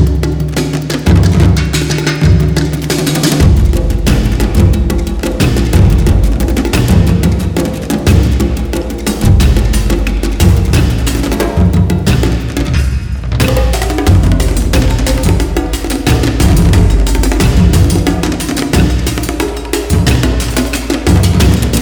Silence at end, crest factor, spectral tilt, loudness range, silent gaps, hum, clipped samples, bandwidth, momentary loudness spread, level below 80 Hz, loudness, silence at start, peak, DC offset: 0 s; 10 dB; -6 dB/octave; 2 LU; none; none; under 0.1%; over 20 kHz; 6 LU; -14 dBFS; -11 LUFS; 0 s; 0 dBFS; under 0.1%